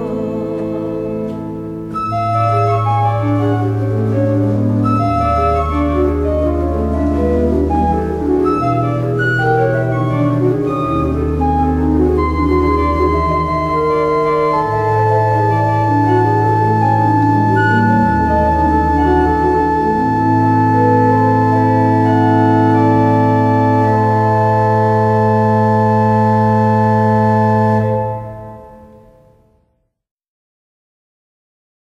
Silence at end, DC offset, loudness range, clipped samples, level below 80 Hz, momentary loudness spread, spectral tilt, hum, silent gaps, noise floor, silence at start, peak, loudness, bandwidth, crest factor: 3.1 s; under 0.1%; 4 LU; under 0.1%; -28 dBFS; 5 LU; -9 dB/octave; none; none; -63 dBFS; 0 s; -2 dBFS; -14 LUFS; 7.4 kHz; 12 dB